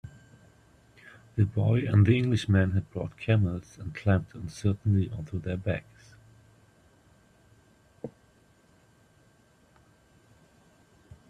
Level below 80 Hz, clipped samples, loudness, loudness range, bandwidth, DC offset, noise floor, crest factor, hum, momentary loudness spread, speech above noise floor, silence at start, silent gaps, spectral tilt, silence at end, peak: -56 dBFS; under 0.1%; -28 LUFS; 13 LU; 9.6 kHz; under 0.1%; -62 dBFS; 20 dB; none; 18 LU; 36 dB; 0.05 s; none; -8 dB/octave; 3.2 s; -10 dBFS